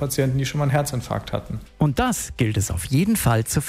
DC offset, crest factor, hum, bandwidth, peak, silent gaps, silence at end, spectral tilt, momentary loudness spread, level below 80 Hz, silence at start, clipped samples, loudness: under 0.1%; 16 dB; none; 16 kHz; -6 dBFS; none; 0 s; -5.5 dB/octave; 8 LU; -38 dBFS; 0 s; under 0.1%; -22 LUFS